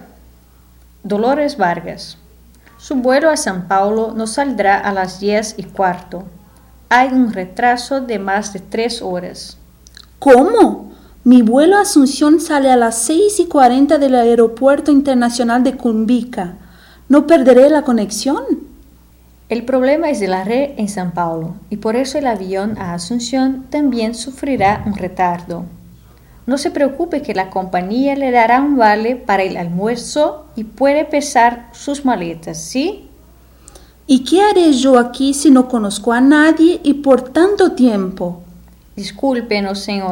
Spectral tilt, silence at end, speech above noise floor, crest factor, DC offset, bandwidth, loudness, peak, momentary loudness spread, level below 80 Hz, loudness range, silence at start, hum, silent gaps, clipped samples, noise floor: -4.5 dB/octave; 0 s; 32 dB; 14 dB; under 0.1%; 16.5 kHz; -14 LUFS; 0 dBFS; 14 LU; -46 dBFS; 7 LU; 1.05 s; none; none; under 0.1%; -45 dBFS